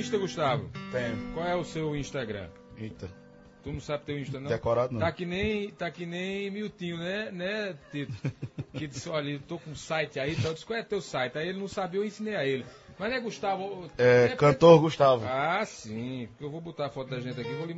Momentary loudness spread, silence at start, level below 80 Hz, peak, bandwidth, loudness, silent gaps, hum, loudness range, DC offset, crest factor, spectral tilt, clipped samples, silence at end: 16 LU; 0 s; -56 dBFS; -4 dBFS; 8 kHz; -29 LUFS; none; none; 11 LU; under 0.1%; 26 dB; -6 dB/octave; under 0.1%; 0 s